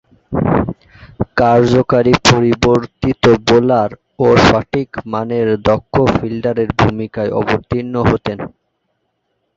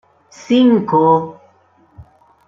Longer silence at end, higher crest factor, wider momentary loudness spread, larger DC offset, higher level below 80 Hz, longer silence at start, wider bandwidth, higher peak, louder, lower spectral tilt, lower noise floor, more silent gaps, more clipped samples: first, 1.1 s vs 0.45 s; about the same, 14 dB vs 14 dB; first, 11 LU vs 5 LU; neither; first, -36 dBFS vs -56 dBFS; second, 0.3 s vs 0.5 s; about the same, 8 kHz vs 7.4 kHz; about the same, 0 dBFS vs -2 dBFS; about the same, -14 LUFS vs -13 LUFS; about the same, -6 dB/octave vs -7 dB/octave; first, -68 dBFS vs -53 dBFS; neither; neither